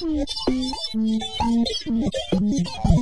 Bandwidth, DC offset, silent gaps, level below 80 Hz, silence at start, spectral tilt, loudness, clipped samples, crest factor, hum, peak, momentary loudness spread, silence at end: 10.5 kHz; 1%; none; -32 dBFS; 0 s; -6 dB/octave; -23 LUFS; under 0.1%; 18 dB; none; -4 dBFS; 3 LU; 0 s